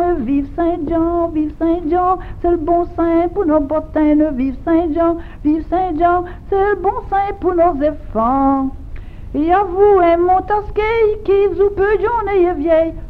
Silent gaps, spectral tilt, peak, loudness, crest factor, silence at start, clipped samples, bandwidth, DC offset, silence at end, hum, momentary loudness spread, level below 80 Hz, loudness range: none; -9 dB/octave; -2 dBFS; -16 LUFS; 14 dB; 0 s; under 0.1%; 4.8 kHz; under 0.1%; 0 s; none; 6 LU; -32 dBFS; 3 LU